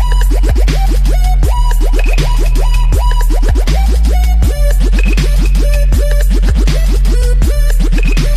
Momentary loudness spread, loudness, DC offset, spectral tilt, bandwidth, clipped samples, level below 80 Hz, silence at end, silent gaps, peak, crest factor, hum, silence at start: 1 LU; -13 LUFS; under 0.1%; -5.5 dB/octave; 14 kHz; under 0.1%; -8 dBFS; 0 s; none; 0 dBFS; 8 dB; none; 0 s